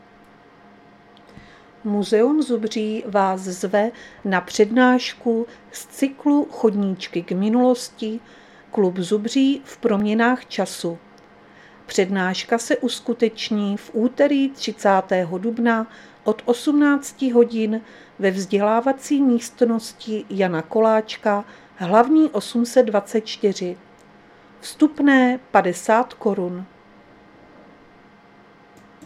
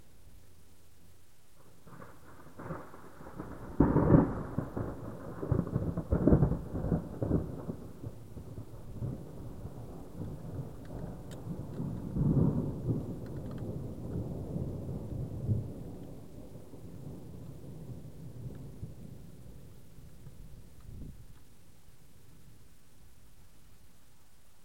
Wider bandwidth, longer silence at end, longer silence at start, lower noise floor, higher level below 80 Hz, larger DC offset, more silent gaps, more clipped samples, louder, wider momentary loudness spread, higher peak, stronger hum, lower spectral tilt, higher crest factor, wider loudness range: second, 14.5 kHz vs 16.5 kHz; first, 2.4 s vs 0.75 s; first, 1.85 s vs 0.15 s; second, -49 dBFS vs -63 dBFS; second, -66 dBFS vs -46 dBFS; second, under 0.1% vs 0.3%; neither; neither; first, -20 LUFS vs -35 LUFS; second, 11 LU vs 24 LU; first, 0 dBFS vs -10 dBFS; neither; second, -5 dB/octave vs -9.5 dB/octave; second, 20 dB vs 26 dB; second, 3 LU vs 20 LU